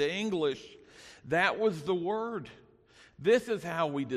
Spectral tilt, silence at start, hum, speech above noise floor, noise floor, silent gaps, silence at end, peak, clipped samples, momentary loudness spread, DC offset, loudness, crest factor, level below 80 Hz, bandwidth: -5 dB/octave; 0 s; none; 30 dB; -60 dBFS; none; 0 s; -12 dBFS; under 0.1%; 23 LU; under 0.1%; -31 LUFS; 20 dB; -68 dBFS; 13.5 kHz